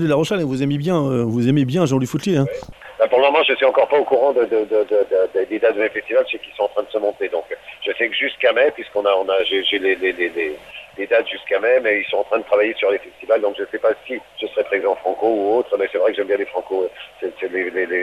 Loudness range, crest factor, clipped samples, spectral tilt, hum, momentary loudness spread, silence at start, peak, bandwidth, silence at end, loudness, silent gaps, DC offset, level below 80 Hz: 4 LU; 16 dB; under 0.1%; -6 dB/octave; none; 9 LU; 0 s; -2 dBFS; 13.5 kHz; 0 s; -19 LUFS; none; under 0.1%; -58 dBFS